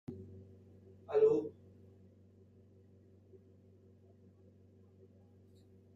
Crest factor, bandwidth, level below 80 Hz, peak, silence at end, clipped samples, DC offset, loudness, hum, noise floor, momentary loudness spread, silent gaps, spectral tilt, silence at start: 22 dB; 7 kHz; -82 dBFS; -18 dBFS; 4.45 s; under 0.1%; under 0.1%; -33 LUFS; none; -63 dBFS; 31 LU; none; -8.5 dB/octave; 0.1 s